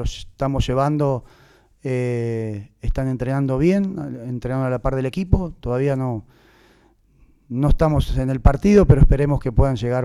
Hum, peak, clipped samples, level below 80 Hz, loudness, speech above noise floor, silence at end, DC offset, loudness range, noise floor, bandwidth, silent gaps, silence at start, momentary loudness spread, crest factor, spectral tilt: none; -4 dBFS; under 0.1%; -26 dBFS; -20 LUFS; 37 dB; 0 s; under 0.1%; 6 LU; -56 dBFS; 12 kHz; none; 0 s; 13 LU; 16 dB; -8 dB/octave